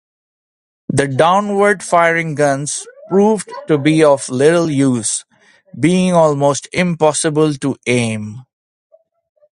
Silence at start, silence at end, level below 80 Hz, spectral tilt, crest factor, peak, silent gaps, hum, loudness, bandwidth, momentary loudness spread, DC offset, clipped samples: 0.9 s; 1.15 s; -54 dBFS; -5 dB/octave; 16 dB; 0 dBFS; none; none; -14 LUFS; 11.5 kHz; 8 LU; under 0.1%; under 0.1%